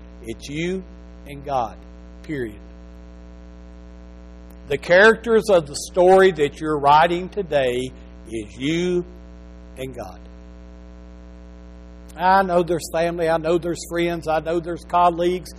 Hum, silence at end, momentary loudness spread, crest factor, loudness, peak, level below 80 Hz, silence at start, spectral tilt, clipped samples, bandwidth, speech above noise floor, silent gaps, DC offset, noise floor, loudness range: 60 Hz at -40 dBFS; 0 s; 20 LU; 16 dB; -19 LUFS; -4 dBFS; -42 dBFS; 0 s; -5 dB/octave; under 0.1%; 14 kHz; 21 dB; none; under 0.1%; -40 dBFS; 15 LU